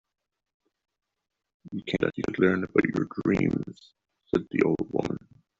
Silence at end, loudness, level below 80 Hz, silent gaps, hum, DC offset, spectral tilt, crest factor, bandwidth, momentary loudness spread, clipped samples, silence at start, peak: 0.4 s; -27 LUFS; -58 dBFS; none; none; under 0.1%; -6 dB/octave; 24 dB; 7.6 kHz; 12 LU; under 0.1%; 1.65 s; -6 dBFS